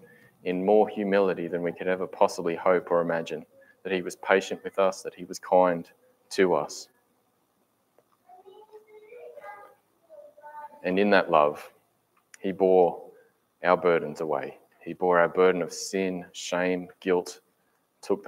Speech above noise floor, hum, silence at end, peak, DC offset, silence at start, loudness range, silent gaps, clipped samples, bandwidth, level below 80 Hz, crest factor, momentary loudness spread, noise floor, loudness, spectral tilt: 46 dB; none; 0 s; -4 dBFS; under 0.1%; 0.45 s; 5 LU; none; under 0.1%; 15.5 kHz; -74 dBFS; 22 dB; 20 LU; -71 dBFS; -26 LUFS; -5 dB/octave